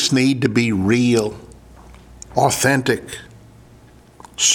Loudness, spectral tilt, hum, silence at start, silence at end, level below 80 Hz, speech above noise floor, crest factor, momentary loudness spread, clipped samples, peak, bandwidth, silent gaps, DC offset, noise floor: -18 LUFS; -3.5 dB/octave; none; 0 s; 0 s; -48 dBFS; 29 dB; 18 dB; 19 LU; under 0.1%; -2 dBFS; 18 kHz; none; under 0.1%; -46 dBFS